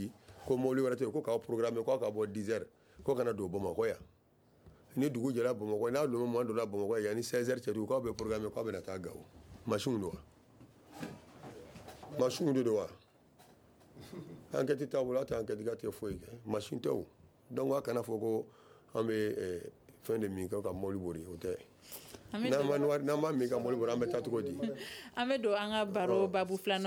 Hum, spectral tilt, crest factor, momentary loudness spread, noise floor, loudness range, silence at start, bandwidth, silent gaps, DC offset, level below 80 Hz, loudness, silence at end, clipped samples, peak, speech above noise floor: none; -6 dB/octave; 18 dB; 16 LU; -67 dBFS; 5 LU; 0 s; over 20 kHz; none; under 0.1%; -66 dBFS; -36 LUFS; 0 s; under 0.1%; -18 dBFS; 33 dB